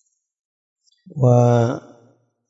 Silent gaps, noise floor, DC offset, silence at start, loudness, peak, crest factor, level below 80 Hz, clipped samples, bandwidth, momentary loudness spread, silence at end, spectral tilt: none; -57 dBFS; under 0.1%; 1.15 s; -17 LUFS; -2 dBFS; 18 dB; -64 dBFS; under 0.1%; 7.4 kHz; 18 LU; 0.7 s; -8.5 dB/octave